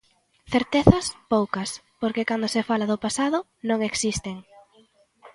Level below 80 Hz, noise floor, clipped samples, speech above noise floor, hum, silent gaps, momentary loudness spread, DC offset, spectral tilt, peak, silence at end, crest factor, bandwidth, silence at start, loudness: -44 dBFS; -59 dBFS; under 0.1%; 36 dB; none; none; 11 LU; under 0.1%; -5 dB/octave; 0 dBFS; 0.05 s; 24 dB; 11.5 kHz; 0.5 s; -24 LUFS